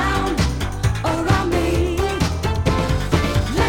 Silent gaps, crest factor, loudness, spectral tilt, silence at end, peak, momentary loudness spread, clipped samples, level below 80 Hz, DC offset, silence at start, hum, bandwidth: none; 16 dB; -20 LUFS; -5.5 dB/octave; 0 s; -4 dBFS; 3 LU; under 0.1%; -26 dBFS; under 0.1%; 0 s; none; 17.5 kHz